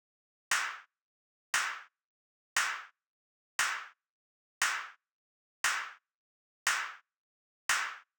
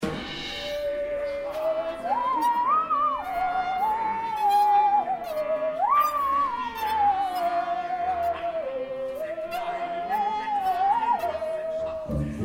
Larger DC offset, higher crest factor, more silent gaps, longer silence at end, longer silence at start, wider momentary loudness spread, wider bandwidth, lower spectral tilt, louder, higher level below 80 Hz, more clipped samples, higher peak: neither; first, 22 dB vs 12 dB; first, 1.02-1.53 s, 2.04-2.56 s, 3.07-3.59 s, 4.10-4.61 s, 5.12-5.64 s, 6.15-6.66 s, 7.17-7.69 s vs none; first, 0.2 s vs 0 s; first, 0.5 s vs 0 s; first, 13 LU vs 9 LU; first, over 20 kHz vs 17 kHz; second, 3 dB/octave vs -5 dB/octave; second, -33 LUFS vs -26 LUFS; second, -84 dBFS vs -50 dBFS; neither; about the same, -16 dBFS vs -14 dBFS